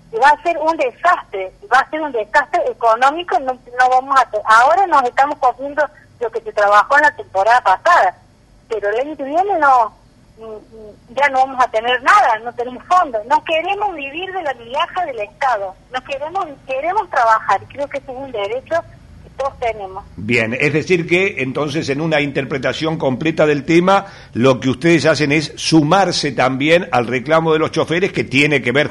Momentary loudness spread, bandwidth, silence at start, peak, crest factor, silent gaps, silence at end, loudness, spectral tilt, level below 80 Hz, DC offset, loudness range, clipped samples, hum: 12 LU; 11.5 kHz; 0.1 s; -2 dBFS; 14 dB; none; 0 s; -15 LUFS; -5 dB/octave; -50 dBFS; under 0.1%; 5 LU; under 0.1%; none